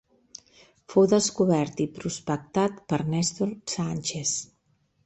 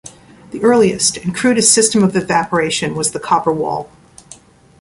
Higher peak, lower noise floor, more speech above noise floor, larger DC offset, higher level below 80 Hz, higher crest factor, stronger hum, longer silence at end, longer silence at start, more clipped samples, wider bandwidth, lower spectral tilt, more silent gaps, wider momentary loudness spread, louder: second, -8 dBFS vs 0 dBFS; first, -69 dBFS vs -43 dBFS; first, 43 dB vs 28 dB; neither; second, -62 dBFS vs -50 dBFS; about the same, 18 dB vs 16 dB; neither; about the same, 0.6 s vs 0.5 s; first, 0.9 s vs 0.05 s; neither; second, 8.6 kHz vs 11.5 kHz; first, -5 dB/octave vs -3.5 dB/octave; neither; first, 22 LU vs 9 LU; second, -26 LUFS vs -14 LUFS